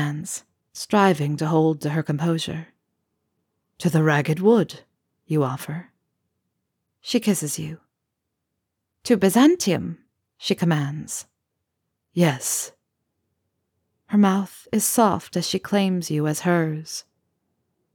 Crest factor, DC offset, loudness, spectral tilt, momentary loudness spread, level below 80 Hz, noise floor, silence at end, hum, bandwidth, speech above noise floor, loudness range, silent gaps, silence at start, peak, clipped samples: 20 dB; under 0.1%; -22 LUFS; -5 dB/octave; 15 LU; -66 dBFS; -80 dBFS; 0.95 s; none; 20 kHz; 59 dB; 5 LU; none; 0 s; -4 dBFS; under 0.1%